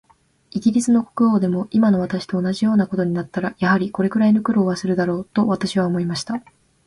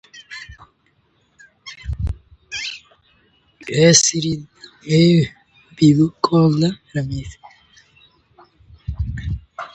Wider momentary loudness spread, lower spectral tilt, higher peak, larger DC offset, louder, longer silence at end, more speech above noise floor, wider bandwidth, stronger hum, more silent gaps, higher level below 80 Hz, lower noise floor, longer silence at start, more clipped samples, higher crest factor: second, 7 LU vs 23 LU; first, -6.5 dB/octave vs -4.5 dB/octave; second, -4 dBFS vs 0 dBFS; neither; second, -20 LUFS vs -17 LUFS; first, 0.45 s vs 0.1 s; second, 32 dB vs 46 dB; first, 11.5 kHz vs 9 kHz; neither; neither; second, -56 dBFS vs -36 dBFS; second, -51 dBFS vs -62 dBFS; first, 0.55 s vs 0.15 s; neither; second, 14 dB vs 20 dB